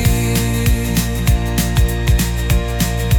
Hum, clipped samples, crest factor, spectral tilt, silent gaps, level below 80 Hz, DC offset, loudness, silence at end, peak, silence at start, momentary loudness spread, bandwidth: none; under 0.1%; 14 dB; -5 dB/octave; none; -18 dBFS; under 0.1%; -17 LUFS; 0 s; -2 dBFS; 0 s; 2 LU; 20 kHz